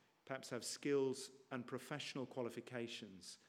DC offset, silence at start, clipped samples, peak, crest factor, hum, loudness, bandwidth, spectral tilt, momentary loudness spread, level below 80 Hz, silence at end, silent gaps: under 0.1%; 0.25 s; under 0.1%; -28 dBFS; 18 dB; none; -46 LUFS; 16 kHz; -4 dB/octave; 11 LU; under -90 dBFS; 0.1 s; none